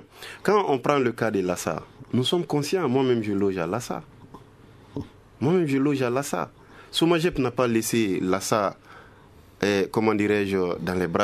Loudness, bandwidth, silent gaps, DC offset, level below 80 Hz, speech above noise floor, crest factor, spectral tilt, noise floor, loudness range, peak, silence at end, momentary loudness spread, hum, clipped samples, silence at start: -24 LUFS; 14 kHz; none; under 0.1%; -54 dBFS; 28 dB; 20 dB; -5.5 dB/octave; -51 dBFS; 3 LU; -4 dBFS; 0 s; 11 LU; none; under 0.1%; 0 s